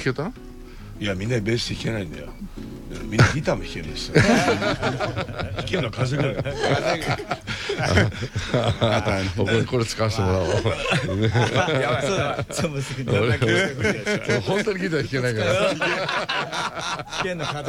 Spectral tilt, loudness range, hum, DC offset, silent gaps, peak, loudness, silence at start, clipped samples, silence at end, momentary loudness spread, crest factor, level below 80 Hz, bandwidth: -5 dB/octave; 3 LU; none; under 0.1%; none; -2 dBFS; -23 LUFS; 0 s; under 0.1%; 0 s; 10 LU; 20 dB; -42 dBFS; 15.5 kHz